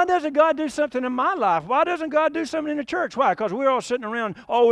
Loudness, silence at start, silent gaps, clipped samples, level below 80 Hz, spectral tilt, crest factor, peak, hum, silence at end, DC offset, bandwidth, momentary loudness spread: -22 LUFS; 0 s; none; under 0.1%; -62 dBFS; -4.5 dB/octave; 16 dB; -6 dBFS; none; 0 s; under 0.1%; 11 kHz; 7 LU